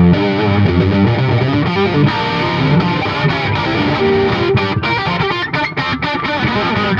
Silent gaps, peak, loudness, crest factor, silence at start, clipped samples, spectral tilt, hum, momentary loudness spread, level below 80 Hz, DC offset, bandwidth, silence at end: none; 0 dBFS; -14 LUFS; 14 dB; 0 s; under 0.1%; -7.5 dB/octave; none; 4 LU; -36 dBFS; under 0.1%; 7.2 kHz; 0 s